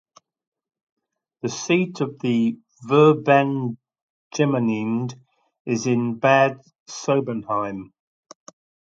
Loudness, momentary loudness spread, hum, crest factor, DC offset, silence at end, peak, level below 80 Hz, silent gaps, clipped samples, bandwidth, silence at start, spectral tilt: -21 LUFS; 17 LU; none; 20 dB; under 0.1%; 1 s; -2 dBFS; -68 dBFS; 4.02-4.31 s, 5.60-5.65 s, 6.80-6.86 s; under 0.1%; 7.8 kHz; 1.45 s; -6 dB/octave